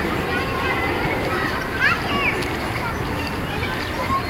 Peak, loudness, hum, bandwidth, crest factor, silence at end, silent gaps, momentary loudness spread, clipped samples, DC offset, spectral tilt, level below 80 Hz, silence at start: -6 dBFS; -22 LUFS; none; 16 kHz; 16 dB; 0 s; none; 6 LU; under 0.1%; under 0.1%; -5 dB/octave; -36 dBFS; 0 s